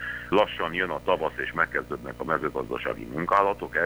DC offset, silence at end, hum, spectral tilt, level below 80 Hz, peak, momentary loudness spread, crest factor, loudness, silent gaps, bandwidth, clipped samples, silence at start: under 0.1%; 0 s; none; -6 dB/octave; -50 dBFS; -8 dBFS; 8 LU; 20 dB; -27 LUFS; none; over 20 kHz; under 0.1%; 0 s